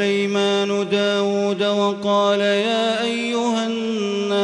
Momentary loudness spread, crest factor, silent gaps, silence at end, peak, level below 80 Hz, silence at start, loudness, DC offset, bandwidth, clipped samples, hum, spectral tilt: 4 LU; 12 dB; none; 0 s; -8 dBFS; -68 dBFS; 0 s; -20 LUFS; under 0.1%; 11 kHz; under 0.1%; none; -4.5 dB/octave